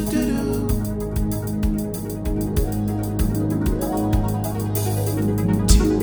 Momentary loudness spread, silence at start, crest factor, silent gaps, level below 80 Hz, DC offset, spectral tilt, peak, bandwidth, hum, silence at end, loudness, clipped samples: 5 LU; 0 s; 20 dB; none; -26 dBFS; under 0.1%; -6.5 dB/octave; 0 dBFS; over 20 kHz; none; 0 s; -22 LUFS; under 0.1%